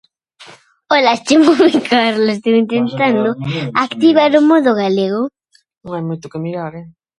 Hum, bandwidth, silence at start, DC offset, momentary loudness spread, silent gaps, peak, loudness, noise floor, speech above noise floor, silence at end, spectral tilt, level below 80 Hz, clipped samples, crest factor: none; 11.5 kHz; 0.4 s; under 0.1%; 14 LU; none; 0 dBFS; -14 LUFS; -42 dBFS; 29 dB; 0.3 s; -5.5 dB/octave; -58 dBFS; under 0.1%; 14 dB